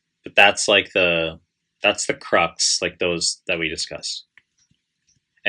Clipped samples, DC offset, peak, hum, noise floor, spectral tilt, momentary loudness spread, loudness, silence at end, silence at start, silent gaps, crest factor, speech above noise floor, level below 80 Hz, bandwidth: under 0.1%; under 0.1%; 0 dBFS; none; -67 dBFS; -1.5 dB/octave; 12 LU; -19 LUFS; 0 s; 0.25 s; none; 22 dB; 47 dB; -60 dBFS; 11.5 kHz